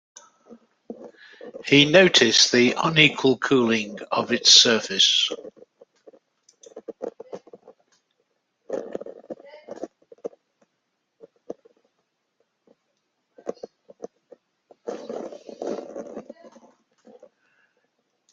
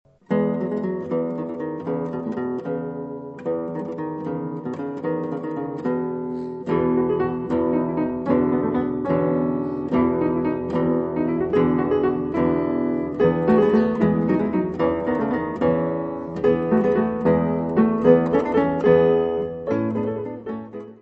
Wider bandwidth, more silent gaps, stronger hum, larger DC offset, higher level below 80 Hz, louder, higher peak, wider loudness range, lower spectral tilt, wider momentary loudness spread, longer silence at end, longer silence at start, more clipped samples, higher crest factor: first, 10 kHz vs 5.8 kHz; neither; neither; neither; second, -68 dBFS vs -50 dBFS; first, -17 LUFS vs -22 LUFS; about the same, 0 dBFS vs -2 dBFS; first, 23 LU vs 8 LU; second, -2.5 dB/octave vs -10 dB/octave; first, 28 LU vs 11 LU; first, 2.1 s vs 0.05 s; first, 0.5 s vs 0.3 s; neither; about the same, 24 dB vs 20 dB